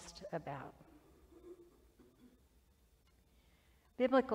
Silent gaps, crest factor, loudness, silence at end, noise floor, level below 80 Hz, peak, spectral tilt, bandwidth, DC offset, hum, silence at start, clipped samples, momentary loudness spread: none; 22 dB; -39 LUFS; 0 s; -71 dBFS; -70 dBFS; -20 dBFS; -5.5 dB/octave; 12 kHz; under 0.1%; none; 0 s; under 0.1%; 27 LU